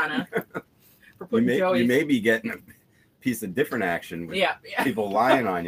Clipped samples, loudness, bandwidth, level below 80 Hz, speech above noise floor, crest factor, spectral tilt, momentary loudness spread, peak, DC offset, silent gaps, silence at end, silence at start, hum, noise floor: under 0.1%; -24 LUFS; 16 kHz; -66 dBFS; 36 dB; 20 dB; -5.5 dB/octave; 12 LU; -6 dBFS; under 0.1%; none; 0 s; 0 s; none; -60 dBFS